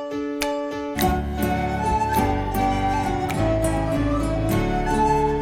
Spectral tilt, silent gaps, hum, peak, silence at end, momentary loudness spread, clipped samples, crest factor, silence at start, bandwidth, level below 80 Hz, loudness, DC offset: -6 dB/octave; none; none; -4 dBFS; 0 s; 5 LU; under 0.1%; 18 dB; 0 s; 16.5 kHz; -30 dBFS; -23 LUFS; under 0.1%